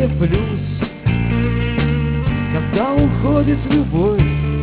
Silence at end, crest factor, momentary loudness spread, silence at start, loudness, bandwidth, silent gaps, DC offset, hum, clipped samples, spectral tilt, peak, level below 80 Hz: 0 s; 14 dB; 4 LU; 0 s; -17 LUFS; 4 kHz; none; under 0.1%; none; under 0.1%; -12 dB/octave; -2 dBFS; -26 dBFS